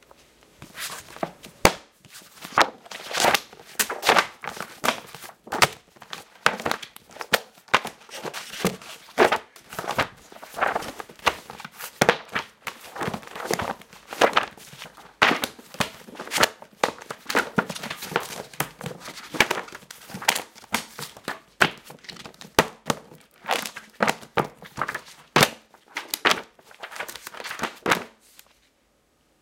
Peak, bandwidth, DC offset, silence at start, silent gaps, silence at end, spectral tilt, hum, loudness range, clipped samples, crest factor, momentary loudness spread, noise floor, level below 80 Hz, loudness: 0 dBFS; 17 kHz; under 0.1%; 0.6 s; none; 1.35 s; -2.5 dB/octave; none; 4 LU; under 0.1%; 28 dB; 19 LU; -65 dBFS; -56 dBFS; -25 LUFS